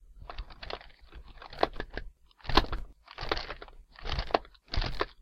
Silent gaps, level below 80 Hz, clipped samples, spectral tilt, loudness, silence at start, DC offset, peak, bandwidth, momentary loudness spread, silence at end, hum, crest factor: none; -40 dBFS; under 0.1%; -5 dB/octave; -35 LUFS; 0 s; under 0.1%; -4 dBFS; 12.5 kHz; 21 LU; 0 s; none; 30 dB